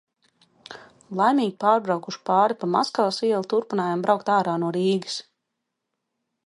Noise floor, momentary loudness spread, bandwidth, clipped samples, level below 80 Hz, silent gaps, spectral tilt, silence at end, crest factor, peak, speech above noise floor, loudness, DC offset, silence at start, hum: -81 dBFS; 13 LU; 11.5 kHz; under 0.1%; -76 dBFS; none; -5.5 dB/octave; 1.25 s; 20 dB; -4 dBFS; 58 dB; -23 LUFS; under 0.1%; 0.7 s; none